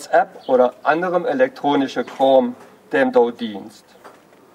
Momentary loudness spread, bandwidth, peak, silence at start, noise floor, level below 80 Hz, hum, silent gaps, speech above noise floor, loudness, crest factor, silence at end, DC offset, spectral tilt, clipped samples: 10 LU; 11 kHz; -2 dBFS; 0 s; -46 dBFS; -68 dBFS; none; none; 28 dB; -18 LUFS; 18 dB; 0.45 s; under 0.1%; -5.5 dB/octave; under 0.1%